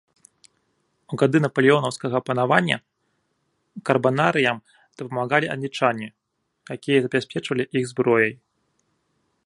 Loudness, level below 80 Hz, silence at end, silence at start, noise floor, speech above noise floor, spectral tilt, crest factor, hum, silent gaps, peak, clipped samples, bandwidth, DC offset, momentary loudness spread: -22 LUFS; -68 dBFS; 1.1 s; 1.1 s; -72 dBFS; 50 dB; -6 dB/octave; 22 dB; none; none; 0 dBFS; under 0.1%; 11.5 kHz; under 0.1%; 14 LU